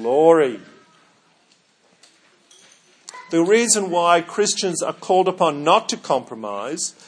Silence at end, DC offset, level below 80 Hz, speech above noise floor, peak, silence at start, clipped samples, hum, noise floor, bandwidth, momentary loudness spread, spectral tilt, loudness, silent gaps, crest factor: 0.15 s; under 0.1%; -78 dBFS; 41 dB; 0 dBFS; 0 s; under 0.1%; none; -59 dBFS; 10.5 kHz; 13 LU; -3 dB/octave; -18 LUFS; none; 20 dB